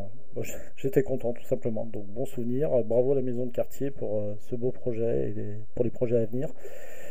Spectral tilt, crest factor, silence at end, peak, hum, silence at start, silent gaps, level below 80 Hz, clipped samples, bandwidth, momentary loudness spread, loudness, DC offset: -8 dB/octave; 20 dB; 0 s; -10 dBFS; none; 0 s; none; -56 dBFS; under 0.1%; 16 kHz; 12 LU; -30 LUFS; 5%